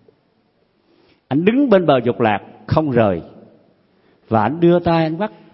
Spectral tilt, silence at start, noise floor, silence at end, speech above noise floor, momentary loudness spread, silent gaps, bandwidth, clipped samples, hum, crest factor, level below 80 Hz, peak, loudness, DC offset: -12 dB/octave; 1.3 s; -61 dBFS; 0.25 s; 45 dB; 9 LU; none; 5.8 kHz; under 0.1%; none; 18 dB; -50 dBFS; 0 dBFS; -17 LUFS; under 0.1%